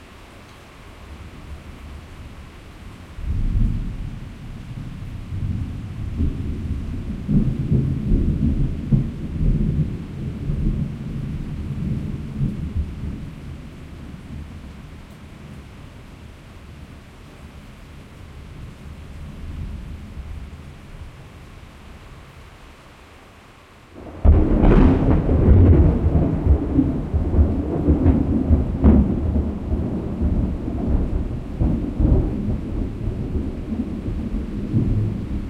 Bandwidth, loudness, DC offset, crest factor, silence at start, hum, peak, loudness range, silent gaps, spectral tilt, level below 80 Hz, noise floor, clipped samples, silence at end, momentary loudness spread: 6.2 kHz; -22 LUFS; under 0.1%; 20 dB; 0 s; none; -2 dBFS; 23 LU; none; -10 dB/octave; -26 dBFS; -46 dBFS; under 0.1%; 0 s; 24 LU